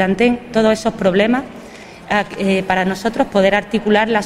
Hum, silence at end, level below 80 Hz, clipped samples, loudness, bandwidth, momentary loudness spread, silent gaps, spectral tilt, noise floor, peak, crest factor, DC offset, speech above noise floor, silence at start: none; 0 s; -44 dBFS; under 0.1%; -16 LUFS; 14 kHz; 9 LU; none; -5.5 dB/octave; -36 dBFS; -2 dBFS; 14 dB; under 0.1%; 20 dB; 0 s